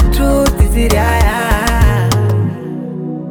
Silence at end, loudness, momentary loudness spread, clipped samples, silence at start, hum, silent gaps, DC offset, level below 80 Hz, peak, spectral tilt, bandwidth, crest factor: 0 s; -14 LUFS; 10 LU; under 0.1%; 0 s; none; none; under 0.1%; -16 dBFS; 0 dBFS; -5.5 dB/octave; 19.5 kHz; 12 dB